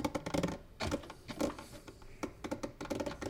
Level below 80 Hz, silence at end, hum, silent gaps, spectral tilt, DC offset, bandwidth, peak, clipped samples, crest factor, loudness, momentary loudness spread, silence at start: -54 dBFS; 0 s; none; none; -5 dB/octave; under 0.1%; 18 kHz; -20 dBFS; under 0.1%; 20 dB; -40 LUFS; 13 LU; 0 s